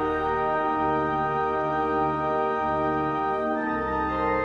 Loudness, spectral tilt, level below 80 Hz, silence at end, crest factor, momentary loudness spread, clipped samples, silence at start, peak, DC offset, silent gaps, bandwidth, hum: -25 LUFS; -8 dB/octave; -46 dBFS; 0 s; 12 dB; 2 LU; under 0.1%; 0 s; -14 dBFS; under 0.1%; none; 7.4 kHz; none